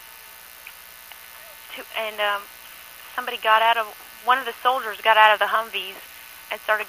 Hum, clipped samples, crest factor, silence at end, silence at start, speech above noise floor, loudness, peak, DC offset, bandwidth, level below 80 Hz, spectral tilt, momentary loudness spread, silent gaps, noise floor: 60 Hz at -70 dBFS; under 0.1%; 24 dB; 0 s; 0 s; 22 dB; -21 LUFS; 0 dBFS; under 0.1%; 15.5 kHz; -68 dBFS; 0 dB/octave; 24 LU; none; -44 dBFS